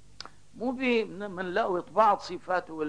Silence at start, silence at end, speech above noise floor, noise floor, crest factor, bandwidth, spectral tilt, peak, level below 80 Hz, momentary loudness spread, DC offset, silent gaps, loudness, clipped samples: 0.2 s; 0 s; 21 dB; -49 dBFS; 20 dB; 10.5 kHz; -5.5 dB/octave; -10 dBFS; -64 dBFS; 18 LU; 0.3%; none; -28 LUFS; under 0.1%